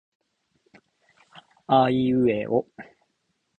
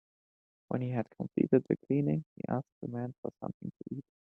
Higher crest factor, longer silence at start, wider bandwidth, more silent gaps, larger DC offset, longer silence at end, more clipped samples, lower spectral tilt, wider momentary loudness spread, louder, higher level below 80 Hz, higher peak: about the same, 20 dB vs 22 dB; first, 1.7 s vs 0.7 s; first, 4.4 kHz vs 3.8 kHz; second, none vs 2.26-2.36 s, 2.72-2.81 s, 3.18-3.23 s, 3.54-3.60 s; neither; first, 0.75 s vs 0.25 s; neither; second, -9 dB/octave vs -11.5 dB/octave; first, 18 LU vs 13 LU; first, -22 LUFS vs -34 LUFS; first, -60 dBFS vs -70 dBFS; first, -6 dBFS vs -12 dBFS